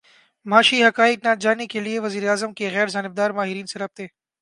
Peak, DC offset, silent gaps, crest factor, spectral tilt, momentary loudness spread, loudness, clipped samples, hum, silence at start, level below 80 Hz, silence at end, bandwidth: 0 dBFS; under 0.1%; none; 20 dB; -3.5 dB/octave; 15 LU; -20 LUFS; under 0.1%; none; 0.45 s; -72 dBFS; 0.35 s; 11.5 kHz